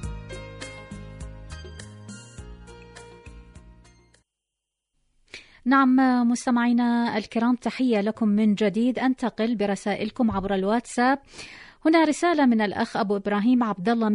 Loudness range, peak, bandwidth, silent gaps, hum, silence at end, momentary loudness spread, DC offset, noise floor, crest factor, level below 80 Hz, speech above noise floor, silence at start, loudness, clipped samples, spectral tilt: 19 LU; -8 dBFS; 11 kHz; none; none; 0 s; 22 LU; under 0.1%; -84 dBFS; 16 dB; -48 dBFS; 62 dB; 0 s; -23 LUFS; under 0.1%; -5.5 dB/octave